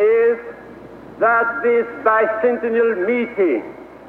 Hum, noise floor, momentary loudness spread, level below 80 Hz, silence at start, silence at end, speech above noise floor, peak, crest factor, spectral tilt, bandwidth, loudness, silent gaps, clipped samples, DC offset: none; -38 dBFS; 20 LU; -58 dBFS; 0 s; 0 s; 20 dB; -4 dBFS; 14 dB; -7.5 dB/octave; 4.2 kHz; -18 LUFS; none; under 0.1%; under 0.1%